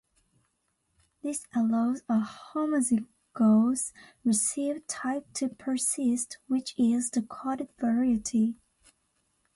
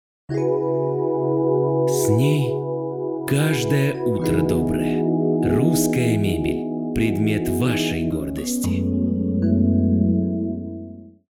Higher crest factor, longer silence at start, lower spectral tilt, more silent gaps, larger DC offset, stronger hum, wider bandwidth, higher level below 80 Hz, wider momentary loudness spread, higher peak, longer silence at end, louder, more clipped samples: about the same, 14 dB vs 16 dB; first, 1.25 s vs 0.3 s; second, -4.5 dB/octave vs -6.5 dB/octave; neither; neither; neither; second, 12 kHz vs 19.5 kHz; second, -66 dBFS vs -44 dBFS; about the same, 9 LU vs 7 LU; second, -14 dBFS vs -6 dBFS; first, 1.05 s vs 0.2 s; second, -28 LUFS vs -21 LUFS; neither